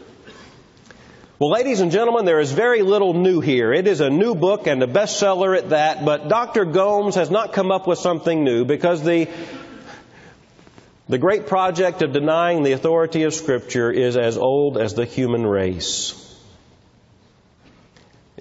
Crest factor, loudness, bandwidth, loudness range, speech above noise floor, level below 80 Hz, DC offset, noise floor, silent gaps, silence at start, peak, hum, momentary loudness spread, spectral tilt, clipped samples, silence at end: 16 dB; -19 LUFS; 8 kHz; 5 LU; 36 dB; -54 dBFS; under 0.1%; -54 dBFS; none; 0.25 s; -4 dBFS; none; 5 LU; -5 dB/octave; under 0.1%; 2.2 s